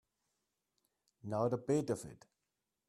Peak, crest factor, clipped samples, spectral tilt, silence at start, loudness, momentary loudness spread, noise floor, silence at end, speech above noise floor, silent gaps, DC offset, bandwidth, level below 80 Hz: -22 dBFS; 20 dB; under 0.1%; -7 dB/octave; 1.25 s; -37 LUFS; 17 LU; -88 dBFS; 0.75 s; 52 dB; none; under 0.1%; 13.5 kHz; -76 dBFS